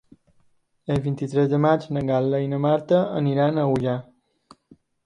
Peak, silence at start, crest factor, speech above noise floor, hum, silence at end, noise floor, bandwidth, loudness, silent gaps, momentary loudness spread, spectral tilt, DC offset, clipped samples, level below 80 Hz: -6 dBFS; 0.9 s; 18 dB; 41 dB; none; 1.05 s; -62 dBFS; 9.8 kHz; -22 LUFS; none; 7 LU; -8.5 dB/octave; under 0.1%; under 0.1%; -54 dBFS